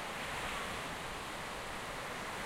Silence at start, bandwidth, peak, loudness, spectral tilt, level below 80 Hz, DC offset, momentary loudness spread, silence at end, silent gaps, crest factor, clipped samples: 0 s; 16 kHz; -30 dBFS; -41 LUFS; -2.5 dB/octave; -56 dBFS; under 0.1%; 3 LU; 0 s; none; 12 dB; under 0.1%